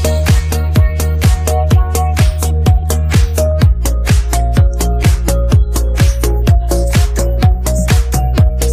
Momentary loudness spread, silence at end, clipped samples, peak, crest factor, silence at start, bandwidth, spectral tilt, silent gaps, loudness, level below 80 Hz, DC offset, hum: 2 LU; 0 s; under 0.1%; 0 dBFS; 10 dB; 0 s; 15.5 kHz; -5.5 dB/octave; none; -13 LUFS; -14 dBFS; under 0.1%; none